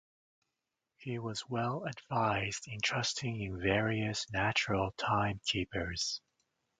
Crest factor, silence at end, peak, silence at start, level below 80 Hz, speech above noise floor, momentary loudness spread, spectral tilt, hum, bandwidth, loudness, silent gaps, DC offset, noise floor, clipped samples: 22 dB; 0.6 s; -14 dBFS; 1 s; -56 dBFS; 53 dB; 7 LU; -4 dB/octave; none; 9.4 kHz; -34 LUFS; none; under 0.1%; -88 dBFS; under 0.1%